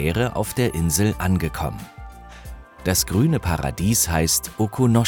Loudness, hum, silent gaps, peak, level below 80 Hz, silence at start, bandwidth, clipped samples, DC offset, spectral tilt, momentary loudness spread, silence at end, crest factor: -21 LUFS; none; none; -4 dBFS; -36 dBFS; 0 s; over 20 kHz; under 0.1%; under 0.1%; -4.5 dB/octave; 21 LU; 0 s; 18 dB